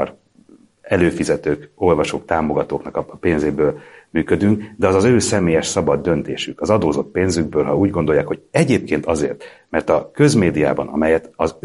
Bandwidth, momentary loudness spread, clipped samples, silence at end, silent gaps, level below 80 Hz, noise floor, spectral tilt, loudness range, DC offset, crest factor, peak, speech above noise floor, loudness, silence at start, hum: 11.5 kHz; 8 LU; under 0.1%; 0.1 s; none; -42 dBFS; -50 dBFS; -6 dB/octave; 2 LU; under 0.1%; 18 dB; 0 dBFS; 32 dB; -18 LUFS; 0 s; none